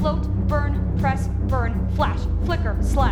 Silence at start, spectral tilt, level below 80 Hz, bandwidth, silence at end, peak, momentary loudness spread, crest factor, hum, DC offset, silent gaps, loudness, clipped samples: 0 s; -7.5 dB/octave; -24 dBFS; 12 kHz; 0 s; -6 dBFS; 2 LU; 14 dB; none; under 0.1%; none; -23 LUFS; under 0.1%